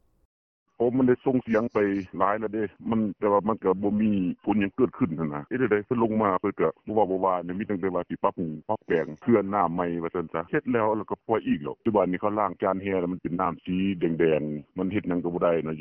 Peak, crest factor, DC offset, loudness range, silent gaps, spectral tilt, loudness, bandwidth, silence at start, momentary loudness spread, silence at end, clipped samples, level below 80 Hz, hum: -8 dBFS; 18 dB; under 0.1%; 2 LU; none; -10 dB/octave; -26 LUFS; 6 kHz; 0.8 s; 6 LU; 0 s; under 0.1%; -60 dBFS; none